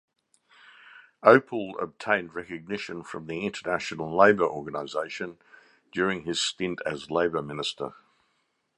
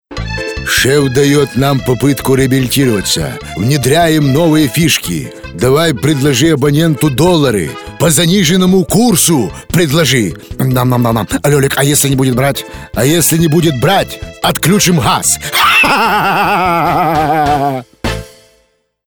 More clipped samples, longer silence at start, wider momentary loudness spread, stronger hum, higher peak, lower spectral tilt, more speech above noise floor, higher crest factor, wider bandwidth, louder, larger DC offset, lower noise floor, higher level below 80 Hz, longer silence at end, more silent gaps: neither; first, 0.85 s vs 0.1 s; first, 16 LU vs 9 LU; neither; about the same, -2 dBFS vs 0 dBFS; about the same, -4 dB/octave vs -4.5 dB/octave; about the same, 47 dB vs 46 dB; first, 26 dB vs 10 dB; second, 11 kHz vs over 20 kHz; second, -27 LUFS vs -11 LUFS; neither; first, -74 dBFS vs -56 dBFS; second, -64 dBFS vs -34 dBFS; about the same, 0.85 s vs 0.8 s; neither